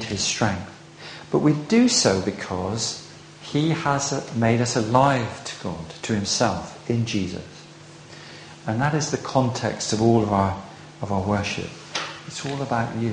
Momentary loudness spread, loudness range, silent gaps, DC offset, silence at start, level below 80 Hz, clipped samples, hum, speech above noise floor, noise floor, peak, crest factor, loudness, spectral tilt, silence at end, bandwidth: 21 LU; 4 LU; none; under 0.1%; 0 s; -52 dBFS; under 0.1%; none; 22 dB; -44 dBFS; -4 dBFS; 20 dB; -23 LUFS; -4.5 dB/octave; 0 s; 10 kHz